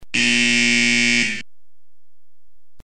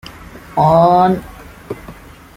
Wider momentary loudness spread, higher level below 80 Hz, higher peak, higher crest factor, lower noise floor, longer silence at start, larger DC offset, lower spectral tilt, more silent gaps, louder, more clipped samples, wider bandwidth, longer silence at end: second, 7 LU vs 21 LU; second, -58 dBFS vs -42 dBFS; second, -6 dBFS vs -2 dBFS; about the same, 16 dB vs 14 dB; first, -77 dBFS vs -37 dBFS; about the same, 0 s vs 0.05 s; first, 3% vs under 0.1%; second, -1.5 dB/octave vs -8 dB/octave; neither; about the same, -15 LUFS vs -13 LUFS; neither; second, 11 kHz vs 16 kHz; second, 0 s vs 0.45 s